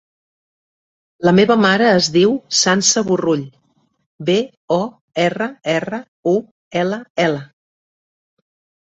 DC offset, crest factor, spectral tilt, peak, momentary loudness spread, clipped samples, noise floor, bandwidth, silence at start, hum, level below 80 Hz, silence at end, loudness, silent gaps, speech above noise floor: under 0.1%; 18 dB; -4 dB/octave; 0 dBFS; 11 LU; under 0.1%; under -90 dBFS; 8.2 kHz; 1.2 s; none; -58 dBFS; 1.35 s; -16 LUFS; 4.06-4.19 s, 4.57-4.68 s, 5.01-5.08 s, 6.08-6.23 s, 6.51-6.71 s, 7.10-7.15 s; over 74 dB